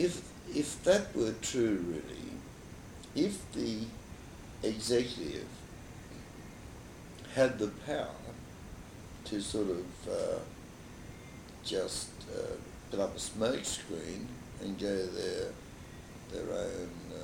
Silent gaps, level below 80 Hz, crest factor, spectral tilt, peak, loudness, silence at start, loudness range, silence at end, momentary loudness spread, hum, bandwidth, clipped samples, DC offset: none; -56 dBFS; 22 dB; -4.5 dB/octave; -14 dBFS; -36 LUFS; 0 s; 5 LU; 0 s; 18 LU; none; 19.5 kHz; under 0.1%; under 0.1%